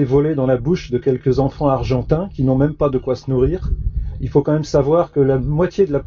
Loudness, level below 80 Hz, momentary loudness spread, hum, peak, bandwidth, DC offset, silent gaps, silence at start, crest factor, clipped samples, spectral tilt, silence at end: -18 LUFS; -30 dBFS; 5 LU; none; -2 dBFS; 7.2 kHz; under 0.1%; none; 0 s; 14 dB; under 0.1%; -8.5 dB/octave; 0 s